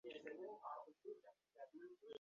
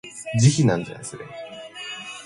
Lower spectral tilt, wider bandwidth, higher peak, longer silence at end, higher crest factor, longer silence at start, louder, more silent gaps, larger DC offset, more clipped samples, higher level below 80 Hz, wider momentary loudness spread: second, -1.5 dB/octave vs -5.5 dB/octave; second, 7 kHz vs 11.5 kHz; second, -36 dBFS vs -4 dBFS; about the same, 0.1 s vs 0 s; about the same, 20 dB vs 20 dB; about the same, 0.05 s vs 0.05 s; second, -57 LUFS vs -21 LUFS; neither; neither; neither; second, under -90 dBFS vs -56 dBFS; second, 8 LU vs 19 LU